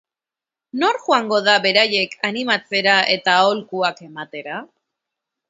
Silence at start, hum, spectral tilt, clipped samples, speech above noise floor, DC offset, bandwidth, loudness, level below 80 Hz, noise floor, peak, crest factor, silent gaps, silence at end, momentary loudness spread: 0.75 s; none; -3 dB/octave; under 0.1%; 70 dB; under 0.1%; 8 kHz; -17 LUFS; -74 dBFS; -89 dBFS; 0 dBFS; 20 dB; none; 0.85 s; 16 LU